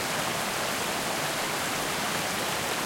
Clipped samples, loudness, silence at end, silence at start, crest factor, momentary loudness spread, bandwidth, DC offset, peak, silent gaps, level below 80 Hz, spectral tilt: under 0.1%; -28 LUFS; 0 s; 0 s; 14 dB; 0 LU; 16.5 kHz; under 0.1%; -14 dBFS; none; -58 dBFS; -2 dB/octave